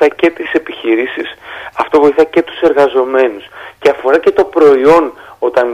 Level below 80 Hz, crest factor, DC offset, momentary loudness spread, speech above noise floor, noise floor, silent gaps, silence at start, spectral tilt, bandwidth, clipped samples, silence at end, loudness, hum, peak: -48 dBFS; 12 dB; under 0.1%; 14 LU; 20 dB; -30 dBFS; none; 0 s; -5.5 dB/octave; 11 kHz; under 0.1%; 0 s; -11 LUFS; none; 0 dBFS